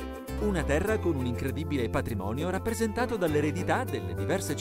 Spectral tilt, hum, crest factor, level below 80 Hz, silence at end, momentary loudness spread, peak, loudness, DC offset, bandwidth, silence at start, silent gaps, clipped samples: -6 dB/octave; none; 16 dB; -42 dBFS; 0 s; 5 LU; -14 dBFS; -30 LUFS; under 0.1%; 16 kHz; 0 s; none; under 0.1%